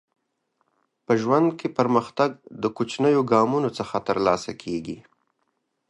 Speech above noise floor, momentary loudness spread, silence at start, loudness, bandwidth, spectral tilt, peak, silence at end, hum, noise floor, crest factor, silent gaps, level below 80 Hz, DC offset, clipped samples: 52 dB; 11 LU; 1.1 s; -23 LUFS; 11.5 kHz; -6.5 dB/octave; -4 dBFS; 0.9 s; none; -74 dBFS; 20 dB; none; -62 dBFS; under 0.1%; under 0.1%